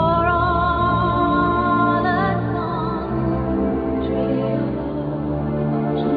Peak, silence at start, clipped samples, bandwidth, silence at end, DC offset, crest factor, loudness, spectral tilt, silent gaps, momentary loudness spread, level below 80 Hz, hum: -6 dBFS; 0 s; under 0.1%; 5 kHz; 0 s; under 0.1%; 14 dB; -20 LUFS; -11 dB/octave; none; 6 LU; -34 dBFS; none